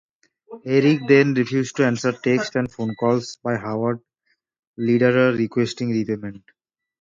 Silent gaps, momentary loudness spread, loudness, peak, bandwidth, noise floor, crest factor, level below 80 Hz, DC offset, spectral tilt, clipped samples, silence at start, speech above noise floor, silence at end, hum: 4.59-4.74 s; 11 LU; -20 LUFS; -2 dBFS; 7.6 kHz; -71 dBFS; 20 dB; -60 dBFS; under 0.1%; -6.5 dB/octave; under 0.1%; 0.5 s; 51 dB; 0.65 s; none